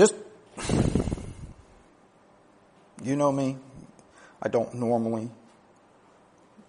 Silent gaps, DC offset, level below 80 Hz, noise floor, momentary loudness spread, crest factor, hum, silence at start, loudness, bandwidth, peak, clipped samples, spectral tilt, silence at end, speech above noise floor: none; under 0.1%; -46 dBFS; -58 dBFS; 20 LU; 22 dB; none; 0 s; -28 LUFS; 10.5 kHz; -8 dBFS; under 0.1%; -6 dB/octave; 1.35 s; 31 dB